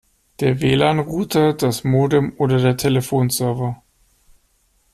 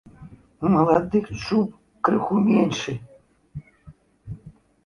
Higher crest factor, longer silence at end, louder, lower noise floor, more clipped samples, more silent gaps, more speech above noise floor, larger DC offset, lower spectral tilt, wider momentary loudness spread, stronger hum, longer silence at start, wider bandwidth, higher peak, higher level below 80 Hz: about the same, 16 dB vs 20 dB; first, 1.2 s vs 0.35 s; first, -18 LUFS vs -22 LUFS; first, -61 dBFS vs -50 dBFS; neither; neither; first, 44 dB vs 30 dB; neither; about the same, -6 dB/octave vs -7 dB/octave; second, 6 LU vs 22 LU; neither; first, 0.4 s vs 0.2 s; first, 14.5 kHz vs 10.5 kHz; about the same, -2 dBFS vs -4 dBFS; about the same, -48 dBFS vs -52 dBFS